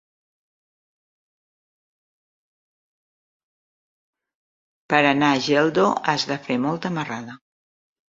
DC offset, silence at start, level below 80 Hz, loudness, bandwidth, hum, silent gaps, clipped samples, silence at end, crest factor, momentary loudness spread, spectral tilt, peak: under 0.1%; 4.9 s; -68 dBFS; -21 LUFS; 7.8 kHz; none; none; under 0.1%; 0.75 s; 24 dB; 11 LU; -5 dB/octave; -2 dBFS